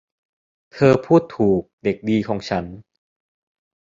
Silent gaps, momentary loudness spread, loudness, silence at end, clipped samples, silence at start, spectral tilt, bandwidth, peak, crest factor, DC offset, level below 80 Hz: 1.73-1.78 s; 9 LU; -19 LUFS; 1.15 s; under 0.1%; 0.75 s; -8 dB/octave; 7.6 kHz; -2 dBFS; 20 dB; under 0.1%; -52 dBFS